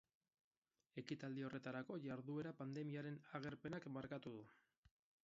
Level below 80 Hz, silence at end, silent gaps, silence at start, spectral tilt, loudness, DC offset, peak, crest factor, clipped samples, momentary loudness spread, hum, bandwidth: -82 dBFS; 0.7 s; none; 0.95 s; -6 dB/octave; -51 LUFS; under 0.1%; -32 dBFS; 20 dB; under 0.1%; 7 LU; none; 7.4 kHz